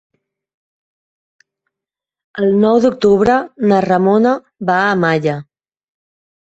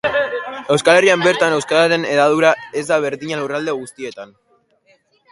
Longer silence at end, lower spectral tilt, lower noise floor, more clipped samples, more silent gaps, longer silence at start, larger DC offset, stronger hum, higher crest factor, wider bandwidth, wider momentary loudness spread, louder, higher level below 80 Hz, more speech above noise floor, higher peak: about the same, 1.15 s vs 1.05 s; first, -7 dB/octave vs -4 dB/octave; first, -86 dBFS vs -57 dBFS; neither; neither; first, 2.35 s vs 0.05 s; neither; neither; about the same, 16 dB vs 18 dB; second, 8 kHz vs 11.5 kHz; second, 8 LU vs 14 LU; about the same, -14 LUFS vs -16 LUFS; first, -52 dBFS vs -60 dBFS; first, 73 dB vs 41 dB; about the same, -2 dBFS vs 0 dBFS